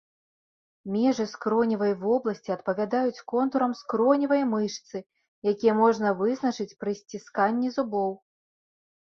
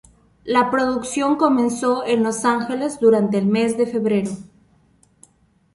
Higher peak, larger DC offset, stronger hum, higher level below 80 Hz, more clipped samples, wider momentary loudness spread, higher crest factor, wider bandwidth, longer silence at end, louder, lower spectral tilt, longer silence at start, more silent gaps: second, -8 dBFS vs -2 dBFS; neither; neither; second, -72 dBFS vs -58 dBFS; neither; first, 10 LU vs 6 LU; about the same, 18 dB vs 18 dB; second, 7.2 kHz vs 11.5 kHz; second, 0.85 s vs 1.3 s; second, -26 LUFS vs -19 LUFS; about the same, -6 dB/octave vs -5.5 dB/octave; first, 0.85 s vs 0.45 s; first, 5.28-5.42 s vs none